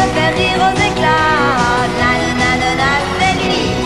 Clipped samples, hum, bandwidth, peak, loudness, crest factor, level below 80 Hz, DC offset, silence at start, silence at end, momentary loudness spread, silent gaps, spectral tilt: under 0.1%; none; 13 kHz; 0 dBFS; -13 LUFS; 12 dB; -32 dBFS; 0.7%; 0 s; 0 s; 2 LU; none; -4.5 dB/octave